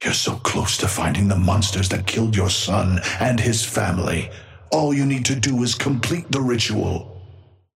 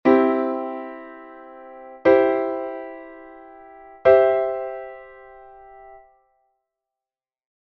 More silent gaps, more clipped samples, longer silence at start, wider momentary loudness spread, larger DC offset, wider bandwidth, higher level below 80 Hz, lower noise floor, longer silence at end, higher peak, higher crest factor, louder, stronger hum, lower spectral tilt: neither; neither; about the same, 0 s vs 0.05 s; second, 5 LU vs 25 LU; neither; first, 16 kHz vs 5.8 kHz; first, -42 dBFS vs -60 dBFS; second, -47 dBFS vs under -90 dBFS; second, 0.4 s vs 1.7 s; about the same, -4 dBFS vs -2 dBFS; about the same, 18 dB vs 22 dB; about the same, -20 LUFS vs -20 LUFS; neither; second, -4.5 dB/octave vs -8 dB/octave